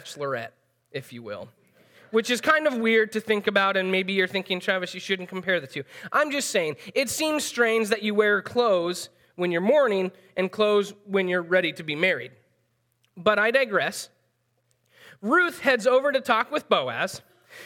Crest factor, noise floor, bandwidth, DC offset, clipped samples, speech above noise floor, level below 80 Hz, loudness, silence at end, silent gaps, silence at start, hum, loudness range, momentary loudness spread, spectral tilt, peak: 20 dB; -71 dBFS; 18 kHz; under 0.1%; under 0.1%; 47 dB; -76 dBFS; -24 LUFS; 0 s; none; 0.05 s; none; 3 LU; 15 LU; -3.5 dB/octave; -4 dBFS